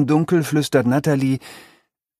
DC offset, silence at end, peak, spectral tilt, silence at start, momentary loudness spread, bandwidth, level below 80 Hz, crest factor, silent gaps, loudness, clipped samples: under 0.1%; 0.6 s; -4 dBFS; -6.5 dB/octave; 0 s; 5 LU; 15.5 kHz; -58 dBFS; 16 dB; none; -19 LUFS; under 0.1%